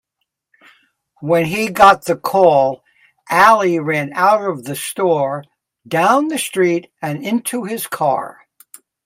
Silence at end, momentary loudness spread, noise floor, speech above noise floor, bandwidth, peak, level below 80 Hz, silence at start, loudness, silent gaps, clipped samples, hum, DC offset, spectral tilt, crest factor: 0.75 s; 13 LU; -75 dBFS; 60 dB; 16.5 kHz; 0 dBFS; -56 dBFS; 1.2 s; -15 LUFS; none; under 0.1%; none; under 0.1%; -4.5 dB/octave; 16 dB